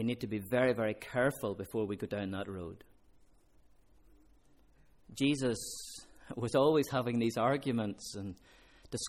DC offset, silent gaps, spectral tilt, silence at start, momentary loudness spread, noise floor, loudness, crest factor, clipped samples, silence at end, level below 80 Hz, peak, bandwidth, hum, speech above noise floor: under 0.1%; none; -5.5 dB/octave; 0 s; 16 LU; -63 dBFS; -34 LUFS; 18 dB; under 0.1%; 0 s; -64 dBFS; -16 dBFS; 17 kHz; none; 30 dB